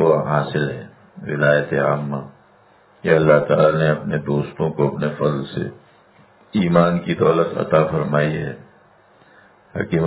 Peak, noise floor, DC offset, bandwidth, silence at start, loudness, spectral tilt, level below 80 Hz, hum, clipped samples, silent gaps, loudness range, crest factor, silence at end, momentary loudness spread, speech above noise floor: 0 dBFS; -52 dBFS; under 0.1%; 4 kHz; 0 s; -19 LUFS; -11.5 dB/octave; -50 dBFS; none; under 0.1%; none; 3 LU; 20 dB; 0 s; 13 LU; 34 dB